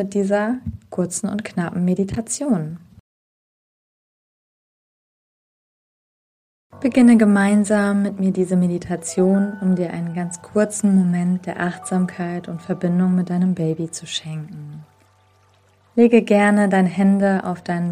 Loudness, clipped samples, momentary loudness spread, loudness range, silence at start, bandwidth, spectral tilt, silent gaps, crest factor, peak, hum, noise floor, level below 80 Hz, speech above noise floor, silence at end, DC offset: -19 LUFS; under 0.1%; 12 LU; 8 LU; 0 s; 11.5 kHz; -6.5 dB/octave; 3.00-6.70 s; 18 dB; -2 dBFS; none; -56 dBFS; -54 dBFS; 38 dB; 0 s; under 0.1%